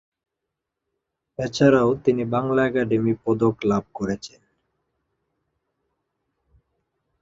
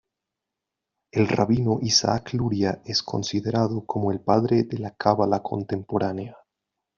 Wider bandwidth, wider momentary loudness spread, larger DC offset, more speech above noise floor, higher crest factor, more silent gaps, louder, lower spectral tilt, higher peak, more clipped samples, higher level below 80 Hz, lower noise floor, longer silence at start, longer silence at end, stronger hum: about the same, 7.8 kHz vs 7.4 kHz; first, 13 LU vs 9 LU; neither; about the same, 62 dB vs 62 dB; about the same, 20 dB vs 20 dB; neither; about the same, -22 LUFS vs -24 LUFS; first, -7 dB/octave vs -5 dB/octave; about the same, -4 dBFS vs -4 dBFS; neither; about the same, -56 dBFS vs -56 dBFS; about the same, -83 dBFS vs -85 dBFS; first, 1.4 s vs 1.15 s; first, 2.95 s vs 0.6 s; neither